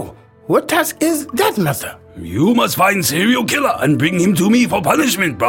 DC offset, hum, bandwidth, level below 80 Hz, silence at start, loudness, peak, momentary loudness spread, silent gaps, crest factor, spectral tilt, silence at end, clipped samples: under 0.1%; none; 17 kHz; -50 dBFS; 0 s; -15 LUFS; 0 dBFS; 7 LU; none; 14 dB; -4.5 dB/octave; 0 s; under 0.1%